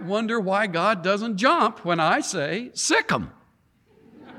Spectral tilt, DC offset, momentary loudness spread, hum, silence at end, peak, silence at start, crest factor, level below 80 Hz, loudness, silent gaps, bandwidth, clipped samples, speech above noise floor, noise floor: -3.5 dB/octave; under 0.1%; 7 LU; none; 0 s; -6 dBFS; 0 s; 18 dB; -60 dBFS; -22 LUFS; none; 15.5 kHz; under 0.1%; 39 dB; -62 dBFS